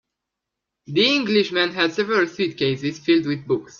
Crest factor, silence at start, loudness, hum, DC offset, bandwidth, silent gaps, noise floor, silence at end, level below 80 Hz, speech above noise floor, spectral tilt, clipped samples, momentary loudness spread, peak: 16 dB; 0.9 s; -20 LUFS; none; under 0.1%; 7.2 kHz; none; -83 dBFS; 0.1 s; -64 dBFS; 62 dB; -5 dB/octave; under 0.1%; 6 LU; -4 dBFS